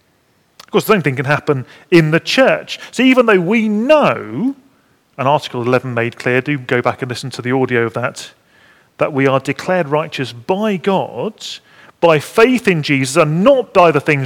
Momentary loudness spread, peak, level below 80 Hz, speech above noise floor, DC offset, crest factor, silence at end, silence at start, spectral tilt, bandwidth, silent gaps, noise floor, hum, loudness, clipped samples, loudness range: 12 LU; 0 dBFS; -56 dBFS; 43 dB; under 0.1%; 14 dB; 0 s; 0.75 s; -5.5 dB/octave; 18 kHz; none; -57 dBFS; none; -15 LUFS; 0.2%; 5 LU